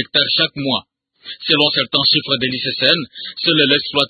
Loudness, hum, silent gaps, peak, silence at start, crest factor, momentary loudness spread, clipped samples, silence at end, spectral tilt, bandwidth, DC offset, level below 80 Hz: -15 LUFS; none; none; 0 dBFS; 0 s; 18 dB; 8 LU; under 0.1%; 0 s; -5.5 dB/octave; 11 kHz; under 0.1%; -58 dBFS